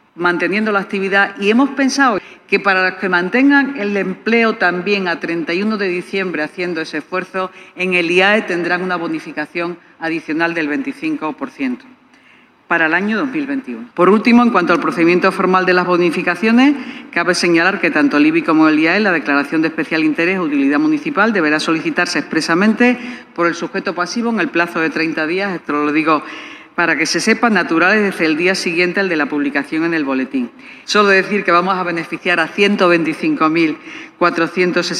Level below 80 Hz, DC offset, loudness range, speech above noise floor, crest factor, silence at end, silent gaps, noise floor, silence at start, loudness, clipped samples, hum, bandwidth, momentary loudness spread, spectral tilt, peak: -66 dBFS; under 0.1%; 5 LU; 33 dB; 14 dB; 0 s; none; -48 dBFS; 0.15 s; -15 LUFS; under 0.1%; none; 12.5 kHz; 10 LU; -5 dB/octave; 0 dBFS